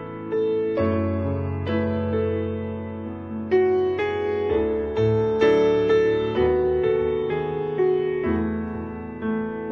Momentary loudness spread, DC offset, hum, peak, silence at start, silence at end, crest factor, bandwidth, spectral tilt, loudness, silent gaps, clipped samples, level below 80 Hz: 11 LU; under 0.1%; none; -8 dBFS; 0 s; 0 s; 14 dB; 6.4 kHz; -8.5 dB/octave; -23 LUFS; none; under 0.1%; -44 dBFS